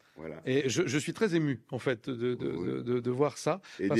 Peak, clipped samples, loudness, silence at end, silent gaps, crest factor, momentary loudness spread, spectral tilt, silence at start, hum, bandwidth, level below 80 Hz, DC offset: -14 dBFS; under 0.1%; -32 LUFS; 0 s; none; 18 dB; 5 LU; -5.5 dB/octave; 0.15 s; none; 13.5 kHz; -70 dBFS; under 0.1%